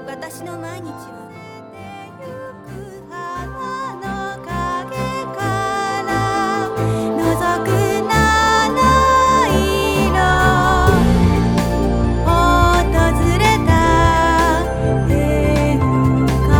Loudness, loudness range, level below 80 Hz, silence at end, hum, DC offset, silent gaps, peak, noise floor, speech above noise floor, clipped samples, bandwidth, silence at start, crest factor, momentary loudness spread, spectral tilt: -16 LUFS; 15 LU; -24 dBFS; 0 s; none; under 0.1%; none; 0 dBFS; -35 dBFS; 5 dB; under 0.1%; 19 kHz; 0 s; 16 dB; 20 LU; -5.5 dB/octave